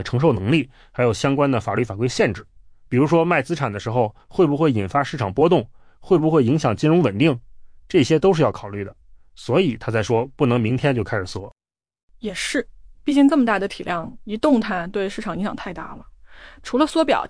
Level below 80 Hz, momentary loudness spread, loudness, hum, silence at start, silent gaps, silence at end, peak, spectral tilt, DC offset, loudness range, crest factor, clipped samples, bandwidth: -48 dBFS; 14 LU; -20 LUFS; none; 0 s; 12.03-12.08 s; 0 s; -6 dBFS; -6.5 dB/octave; under 0.1%; 4 LU; 14 dB; under 0.1%; 10.5 kHz